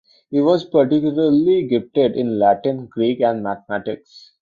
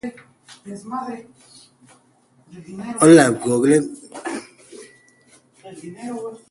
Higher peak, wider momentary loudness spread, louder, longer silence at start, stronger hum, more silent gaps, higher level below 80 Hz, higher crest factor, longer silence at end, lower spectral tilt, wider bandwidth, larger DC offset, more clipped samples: about the same, -2 dBFS vs 0 dBFS; second, 9 LU vs 26 LU; about the same, -18 LUFS vs -17 LUFS; first, 0.3 s vs 0.05 s; neither; neither; about the same, -60 dBFS vs -62 dBFS; second, 16 dB vs 22 dB; about the same, 0.25 s vs 0.15 s; first, -8.5 dB/octave vs -5 dB/octave; second, 7 kHz vs 11.5 kHz; neither; neither